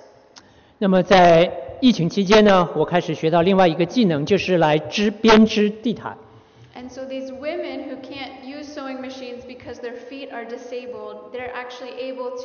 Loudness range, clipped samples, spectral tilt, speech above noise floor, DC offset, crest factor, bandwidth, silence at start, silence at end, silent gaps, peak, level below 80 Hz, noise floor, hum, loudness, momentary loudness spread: 16 LU; under 0.1%; -4.5 dB/octave; 30 dB; under 0.1%; 16 dB; 6.8 kHz; 0.35 s; 0 s; none; -4 dBFS; -48 dBFS; -49 dBFS; none; -17 LUFS; 20 LU